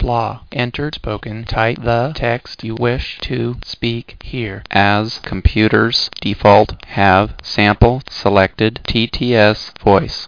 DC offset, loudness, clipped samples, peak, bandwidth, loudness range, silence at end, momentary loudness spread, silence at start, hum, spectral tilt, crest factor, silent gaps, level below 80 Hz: 0.3%; -16 LUFS; 0.2%; 0 dBFS; 5.4 kHz; 6 LU; 0 s; 11 LU; 0 s; none; -6.5 dB/octave; 16 dB; none; -28 dBFS